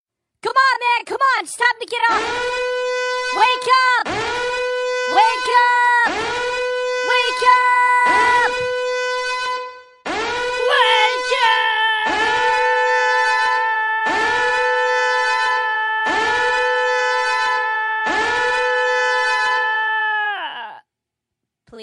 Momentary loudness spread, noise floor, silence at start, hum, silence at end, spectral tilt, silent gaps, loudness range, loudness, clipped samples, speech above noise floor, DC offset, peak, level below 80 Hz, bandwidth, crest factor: 7 LU; -82 dBFS; 0.45 s; none; 0 s; -1 dB/octave; none; 3 LU; -17 LUFS; under 0.1%; 65 dB; under 0.1%; -2 dBFS; -54 dBFS; 11.5 kHz; 16 dB